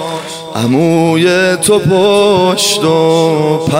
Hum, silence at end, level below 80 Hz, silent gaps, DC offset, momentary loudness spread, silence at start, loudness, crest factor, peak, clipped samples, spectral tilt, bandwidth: none; 0 s; -50 dBFS; none; under 0.1%; 7 LU; 0 s; -10 LUFS; 10 dB; 0 dBFS; under 0.1%; -4.5 dB/octave; 16 kHz